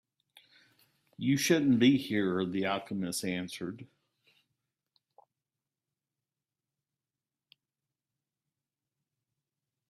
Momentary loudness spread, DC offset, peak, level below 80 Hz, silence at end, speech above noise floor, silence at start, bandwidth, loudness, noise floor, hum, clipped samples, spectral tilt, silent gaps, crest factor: 15 LU; under 0.1%; -12 dBFS; -74 dBFS; 6.05 s; over 61 dB; 1.2 s; 15.5 kHz; -30 LUFS; under -90 dBFS; none; under 0.1%; -5 dB/octave; none; 22 dB